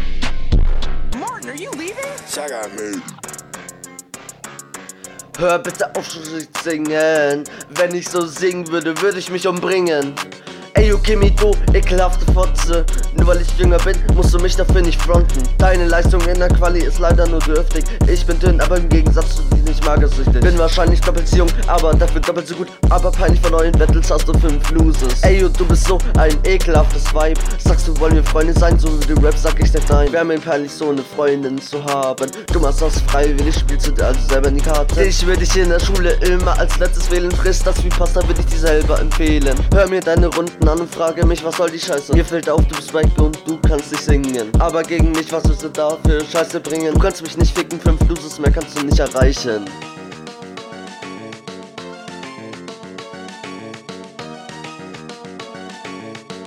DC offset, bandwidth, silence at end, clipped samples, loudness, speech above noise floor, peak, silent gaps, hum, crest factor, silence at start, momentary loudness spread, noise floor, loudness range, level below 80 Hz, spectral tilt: under 0.1%; 15 kHz; 0 s; under 0.1%; -17 LUFS; 23 dB; 0 dBFS; none; none; 14 dB; 0 s; 17 LU; -36 dBFS; 12 LU; -16 dBFS; -5.5 dB/octave